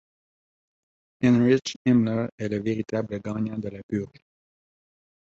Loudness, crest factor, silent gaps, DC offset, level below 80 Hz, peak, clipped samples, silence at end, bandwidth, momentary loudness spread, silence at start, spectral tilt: -25 LUFS; 18 dB; 1.76-1.85 s, 2.32-2.38 s, 3.83-3.89 s; under 0.1%; -60 dBFS; -8 dBFS; under 0.1%; 1.25 s; 7.8 kHz; 11 LU; 1.2 s; -7 dB/octave